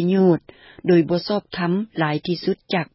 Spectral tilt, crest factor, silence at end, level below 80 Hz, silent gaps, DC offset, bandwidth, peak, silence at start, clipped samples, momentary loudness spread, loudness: -11 dB/octave; 14 dB; 0.1 s; -60 dBFS; none; under 0.1%; 5.8 kHz; -6 dBFS; 0 s; under 0.1%; 7 LU; -21 LUFS